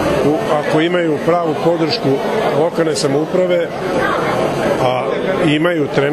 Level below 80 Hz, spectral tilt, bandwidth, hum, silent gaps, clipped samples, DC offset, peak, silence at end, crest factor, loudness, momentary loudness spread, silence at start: -44 dBFS; -5.5 dB/octave; 14 kHz; none; none; under 0.1%; under 0.1%; 0 dBFS; 0 s; 14 dB; -15 LUFS; 2 LU; 0 s